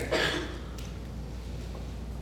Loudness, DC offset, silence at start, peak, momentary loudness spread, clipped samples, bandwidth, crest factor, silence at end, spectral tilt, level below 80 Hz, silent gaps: -35 LUFS; under 0.1%; 0 s; -14 dBFS; 12 LU; under 0.1%; 18 kHz; 20 dB; 0 s; -4.5 dB/octave; -40 dBFS; none